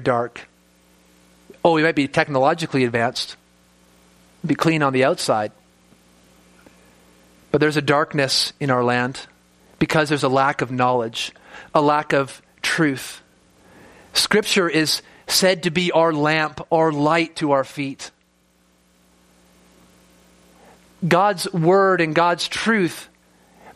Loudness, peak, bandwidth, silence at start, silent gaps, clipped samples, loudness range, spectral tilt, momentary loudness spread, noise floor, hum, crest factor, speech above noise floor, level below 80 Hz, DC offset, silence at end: -19 LUFS; 0 dBFS; 15 kHz; 0 s; none; under 0.1%; 5 LU; -4.5 dB/octave; 12 LU; -60 dBFS; none; 22 dB; 41 dB; -58 dBFS; under 0.1%; 0.05 s